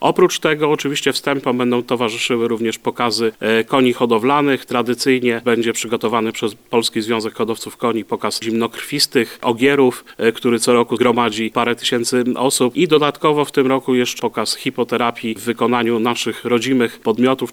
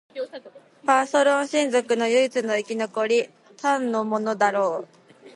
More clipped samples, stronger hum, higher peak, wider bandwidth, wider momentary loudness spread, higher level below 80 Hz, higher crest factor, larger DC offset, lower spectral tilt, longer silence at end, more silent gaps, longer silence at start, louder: neither; neither; first, -2 dBFS vs -6 dBFS; first, 20 kHz vs 11.5 kHz; second, 6 LU vs 14 LU; first, -62 dBFS vs -78 dBFS; about the same, 16 dB vs 18 dB; neither; about the same, -4 dB/octave vs -3.5 dB/octave; about the same, 0 s vs 0.05 s; neither; second, 0 s vs 0.15 s; first, -17 LUFS vs -23 LUFS